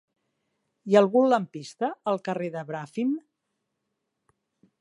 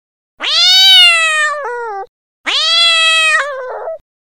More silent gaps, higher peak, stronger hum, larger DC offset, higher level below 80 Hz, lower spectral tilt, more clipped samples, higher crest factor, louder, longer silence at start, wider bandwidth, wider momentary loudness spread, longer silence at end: second, none vs 2.09-2.44 s; second, -6 dBFS vs 0 dBFS; neither; second, under 0.1% vs 0.5%; second, -82 dBFS vs -60 dBFS; first, -6.5 dB/octave vs 4 dB/octave; second, under 0.1% vs 0.4%; first, 22 dB vs 12 dB; second, -26 LUFS vs -7 LUFS; first, 0.85 s vs 0.4 s; second, 11.5 kHz vs over 20 kHz; second, 14 LU vs 21 LU; first, 1.6 s vs 0.3 s